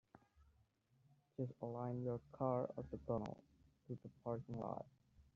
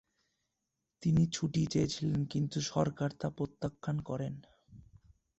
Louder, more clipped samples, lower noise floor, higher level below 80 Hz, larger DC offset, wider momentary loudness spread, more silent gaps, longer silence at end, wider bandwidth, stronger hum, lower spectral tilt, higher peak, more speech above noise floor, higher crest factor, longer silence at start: second, -47 LUFS vs -34 LUFS; neither; second, -77 dBFS vs -86 dBFS; second, -72 dBFS vs -60 dBFS; neither; first, 12 LU vs 9 LU; neither; second, 0.15 s vs 0.6 s; second, 7 kHz vs 8.2 kHz; neither; first, -10 dB/octave vs -6 dB/octave; second, -26 dBFS vs -16 dBFS; second, 32 dB vs 53 dB; about the same, 22 dB vs 20 dB; second, 0.15 s vs 1 s